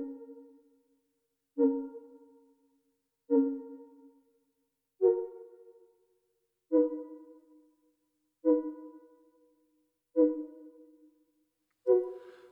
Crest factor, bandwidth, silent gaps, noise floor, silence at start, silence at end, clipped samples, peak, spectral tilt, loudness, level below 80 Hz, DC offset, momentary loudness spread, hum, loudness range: 20 dB; 2.1 kHz; none; -81 dBFS; 0 s; 0.2 s; under 0.1%; -14 dBFS; -9.5 dB/octave; -31 LUFS; -86 dBFS; under 0.1%; 23 LU; 50 Hz at -100 dBFS; 3 LU